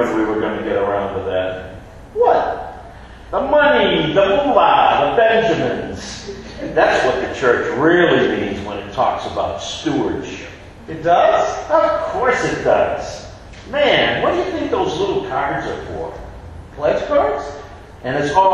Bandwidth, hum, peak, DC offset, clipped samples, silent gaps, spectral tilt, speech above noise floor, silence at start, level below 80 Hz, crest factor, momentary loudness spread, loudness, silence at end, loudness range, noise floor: 11 kHz; none; 0 dBFS; under 0.1%; under 0.1%; none; -5 dB/octave; 20 dB; 0 s; -42 dBFS; 18 dB; 18 LU; -17 LUFS; 0 s; 6 LU; -36 dBFS